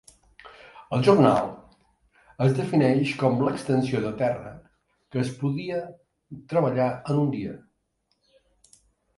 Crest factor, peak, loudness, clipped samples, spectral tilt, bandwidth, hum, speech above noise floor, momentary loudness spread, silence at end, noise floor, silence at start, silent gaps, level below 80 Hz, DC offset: 22 dB; -4 dBFS; -24 LUFS; under 0.1%; -7.5 dB/octave; 11.5 kHz; none; 50 dB; 17 LU; 1.6 s; -74 dBFS; 0.45 s; none; -60 dBFS; under 0.1%